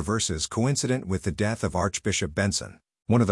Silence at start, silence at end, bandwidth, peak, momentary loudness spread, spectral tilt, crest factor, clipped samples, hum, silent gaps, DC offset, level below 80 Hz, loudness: 0 s; 0 s; 12 kHz; -8 dBFS; 5 LU; -4.5 dB/octave; 18 dB; under 0.1%; none; none; under 0.1%; -48 dBFS; -26 LUFS